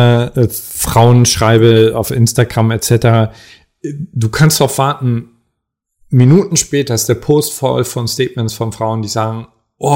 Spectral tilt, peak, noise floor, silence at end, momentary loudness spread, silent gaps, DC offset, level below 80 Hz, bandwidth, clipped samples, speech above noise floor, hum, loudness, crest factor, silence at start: -5.5 dB/octave; 0 dBFS; -73 dBFS; 0 s; 11 LU; none; under 0.1%; -40 dBFS; 16.5 kHz; under 0.1%; 61 dB; none; -12 LUFS; 12 dB; 0 s